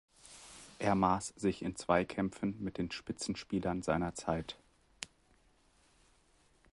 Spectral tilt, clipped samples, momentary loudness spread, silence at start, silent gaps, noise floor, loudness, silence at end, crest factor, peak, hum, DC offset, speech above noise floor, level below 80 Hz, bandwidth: -5.5 dB/octave; under 0.1%; 20 LU; 0.25 s; none; -69 dBFS; -36 LUFS; 1.65 s; 24 dB; -14 dBFS; none; under 0.1%; 34 dB; -58 dBFS; 11.5 kHz